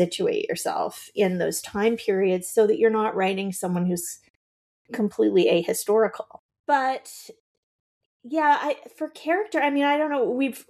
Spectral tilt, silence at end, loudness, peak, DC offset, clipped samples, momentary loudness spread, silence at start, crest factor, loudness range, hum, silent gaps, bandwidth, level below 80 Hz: -4.5 dB/octave; 0.1 s; -24 LUFS; -8 dBFS; under 0.1%; under 0.1%; 13 LU; 0 s; 16 dB; 3 LU; none; 4.30-4.85 s, 6.39-6.49 s, 6.59-6.64 s, 7.40-8.20 s; 15 kHz; -68 dBFS